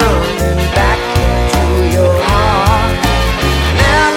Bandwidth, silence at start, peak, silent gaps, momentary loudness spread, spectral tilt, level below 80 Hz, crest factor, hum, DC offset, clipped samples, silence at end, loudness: 17 kHz; 0 s; 0 dBFS; none; 3 LU; -5 dB/octave; -16 dBFS; 10 dB; none; under 0.1%; under 0.1%; 0 s; -12 LUFS